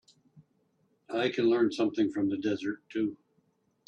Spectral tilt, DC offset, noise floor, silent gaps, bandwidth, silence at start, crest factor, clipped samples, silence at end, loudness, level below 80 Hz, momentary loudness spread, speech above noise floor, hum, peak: -6 dB/octave; under 0.1%; -72 dBFS; none; 8.8 kHz; 0.35 s; 16 dB; under 0.1%; 0.7 s; -30 LUFS; -74 dBFS; 9 LU; 43 dB; none; -16 dBFS